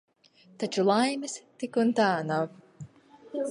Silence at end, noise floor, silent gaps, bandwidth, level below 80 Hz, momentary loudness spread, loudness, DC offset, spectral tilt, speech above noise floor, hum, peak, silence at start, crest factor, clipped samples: 0 s; -53 dBFS; none; 11.5 kHz; -76 dBFS; 24 LU; -28 LUFS; under 0.1%; -5 dB/octave; 26 dB; none; -10 dBFS; 0.6 s; 18 dB; under 0.1%